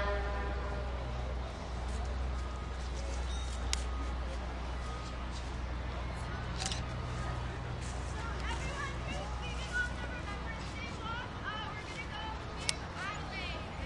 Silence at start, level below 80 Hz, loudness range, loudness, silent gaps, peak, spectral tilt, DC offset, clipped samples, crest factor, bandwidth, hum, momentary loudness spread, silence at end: 0 s; -40 dBFS; 1 LU; -39 LUFS; none; -10 dBFS; -4.5 dB/octave; under 0.1%; under 0.1%; 28 dB; 11.5 kHz; none; 5 LU; 0 s